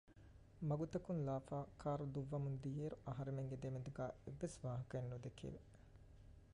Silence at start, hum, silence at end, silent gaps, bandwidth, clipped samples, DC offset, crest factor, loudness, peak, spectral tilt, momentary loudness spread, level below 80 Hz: 0.05 s; none; 0 s; none; 11 kHz; under 0.1%; under 0.1%; 14 dB; -47 LUFS; -32 dBFS; -8 dB/octave; 21 LU; -66 dBFS